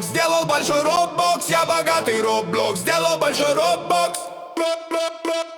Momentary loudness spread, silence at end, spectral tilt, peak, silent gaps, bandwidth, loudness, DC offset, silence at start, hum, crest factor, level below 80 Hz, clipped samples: 6 LU; 0 s; -2.5 dB/octave; -4 dBFS; none; over 20 kHz; -20 LUFS; under 0.1%; 0 s; none; 16 dB; -60 dBFS; under 0.1%